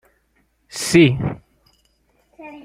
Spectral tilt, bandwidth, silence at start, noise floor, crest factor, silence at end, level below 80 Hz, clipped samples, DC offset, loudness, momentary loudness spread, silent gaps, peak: -5.5 dB/octave; 15.5 kHz; 0.75 s; -64 dBFS; 20 dB; 0.05 s; -48 dBFS; under 0.1%; under 0.1%; -17 LUFS; 24 LU; none; 0 dBFS